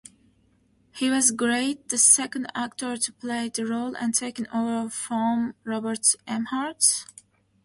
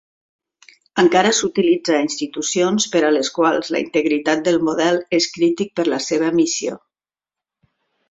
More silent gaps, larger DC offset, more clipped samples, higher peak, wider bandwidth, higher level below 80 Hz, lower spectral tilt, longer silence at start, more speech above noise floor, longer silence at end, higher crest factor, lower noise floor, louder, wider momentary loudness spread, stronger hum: neither; neither; neither; about the same, -2 dBFS vs 0 dBFS; first, 12 kHz vs 8 kHz; second, -68 dBFS vs -62 dBFS; second, -1.5 dB/octave vs -3.5 dB/octave; about the same, 0.95 s vs 0.95 s; second, 38 dB vs over 73 dB; second, 0.6 s vs 1.35 s; first, 24 dB vs 18 dB; second, -64 dBFS vs under -90 dBFS; second, -24 LUFS vs -18 LUFS; first, 11 LU vs 6 LU; neither